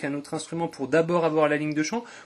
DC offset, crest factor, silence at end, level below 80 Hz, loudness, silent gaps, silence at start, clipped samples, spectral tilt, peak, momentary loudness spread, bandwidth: under 0.1%; 18 dB; 0 s; -68 dBFS; -25 LUFS; none; 0 s; under 0.1%; -5.5 dB/octave; -8 dBFS; 9 LU; 12 kHz